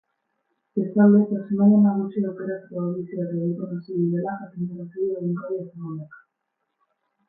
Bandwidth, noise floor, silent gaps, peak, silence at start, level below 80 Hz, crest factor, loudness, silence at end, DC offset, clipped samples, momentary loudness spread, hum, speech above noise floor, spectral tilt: 2.1 kHz; -78 dBFS; none; -6 dBFS; 0.75 s; -72 dBFS; 18 dB; -23 LUFS; 1.1 s; under 0.1%; under 0.1%; 15 LU; none; 56 dB; -14.5 dB/octave